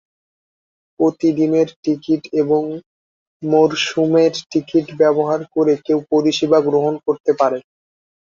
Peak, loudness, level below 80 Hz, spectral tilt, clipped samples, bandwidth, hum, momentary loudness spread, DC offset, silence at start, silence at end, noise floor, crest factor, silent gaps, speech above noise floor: -2 dBFS; -17 LUFS; -62 dBFS; -5.5 dB/octave; under 0.1%; 7.4 kHz; none; 5 LU; under 0.1%; 1 s; 0.65 s; under -90 dBFS; 16 dB; 1.76-1.83 s, 2.86-3.40 s, 7.20-7.24 s; over 74 dB